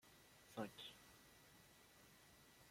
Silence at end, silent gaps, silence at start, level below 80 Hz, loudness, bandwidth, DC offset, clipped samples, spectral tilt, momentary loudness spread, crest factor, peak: 0 s; none; 0 s; -82 dBFS; -59 LUFS; 16.5 kHz; under 0.1%; under 0.1%; -4 dB/octave; 14 LU; 26 dB; -34 dBFS